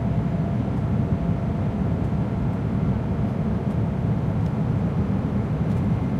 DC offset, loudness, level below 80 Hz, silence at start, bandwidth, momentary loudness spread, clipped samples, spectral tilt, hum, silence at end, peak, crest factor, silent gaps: under 0.1%; -24 LUFS; -36 dBFS; 0 s; 7.6 kHz; 1 LU; under 0.1%; -10 dB/octave; none; 0 s; -10 dBFS; 12 dB; none